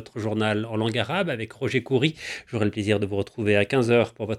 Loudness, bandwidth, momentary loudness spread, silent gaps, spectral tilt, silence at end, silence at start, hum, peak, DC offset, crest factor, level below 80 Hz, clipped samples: -24 LUFS; 12 kHz; 8 LU; none; -6 dB/octave; 0 s; 0 s; none; -6 dBFS; under 0.1%; 18 dB; -62 dBFS; under 0.1%